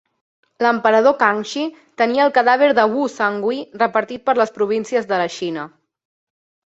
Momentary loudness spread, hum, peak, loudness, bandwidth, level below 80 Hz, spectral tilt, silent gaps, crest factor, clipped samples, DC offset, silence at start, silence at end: 11 LU; none; 0 dBFS; -18 LUFS; 8 kHz; -66 dBFS; -4.5 dB/octave; none; 18 dB; under 0.1%; under 0.1%; 0.6 s; 1 s